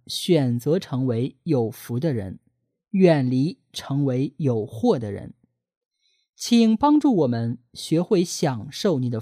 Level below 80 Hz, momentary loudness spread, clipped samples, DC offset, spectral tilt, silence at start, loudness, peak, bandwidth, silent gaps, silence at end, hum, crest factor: -62 dBFS; 11 LU; under 0.1%; under 0.1%; -6.5 dB/octave; 0.1 s; -22 LUFS; -4 dBFS; 15.5 kHz; 5.77-5.91 s, 6.29-6.33 s; 0 s; none; 18 dB